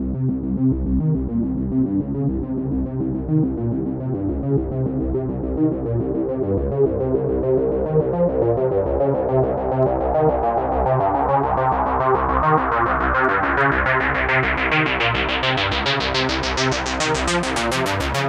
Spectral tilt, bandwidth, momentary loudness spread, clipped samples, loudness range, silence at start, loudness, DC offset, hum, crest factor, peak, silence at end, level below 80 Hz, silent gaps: -5.5 dB/octave; 13.5 kHz; 6 LU; under 0.1%; 5 LU; 0 s; -20 LUFS; under 0.1%; none; 16 dB; -4 dBFS; 0 s; -32 dBFS; none